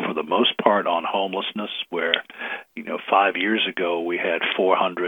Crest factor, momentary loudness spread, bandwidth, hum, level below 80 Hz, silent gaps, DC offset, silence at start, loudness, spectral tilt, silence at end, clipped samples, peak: 22 dB; 12 LU; 19 kHz; none; -78 dBFS; none; under 0.1%; 0 s; -22 LUFS; -6 dB/octave; 0 s; under 0.1%; 0 dBFS